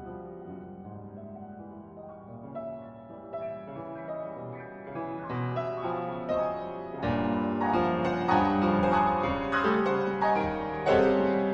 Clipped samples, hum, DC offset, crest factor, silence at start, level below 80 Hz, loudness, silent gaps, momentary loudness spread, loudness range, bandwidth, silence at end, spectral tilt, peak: under 0.1%; none; under 0.1%; 18 dB; 0 s; -52 dBFS; -28 LUFS; none; 19 LU; 16 LU; 7.8 kHz; 0 s; -8 dB/octave; -10 dBFS